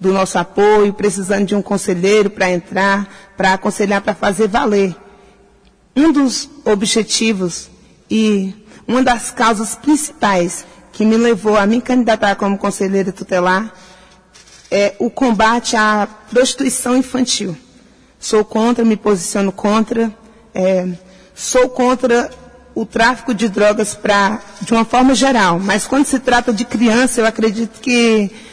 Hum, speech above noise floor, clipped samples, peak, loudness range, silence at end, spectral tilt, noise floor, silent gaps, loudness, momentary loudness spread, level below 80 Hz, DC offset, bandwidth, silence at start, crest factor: none; 35 dB; under 0.1%; -2 dBFS; 3 LU; 0.05 s; -4 dB/octave; -50 dBFS; none; -15 LUFS; 8 LU; -44 dBFS; under 0.1%; 11 kHz; 0 s; 14 dB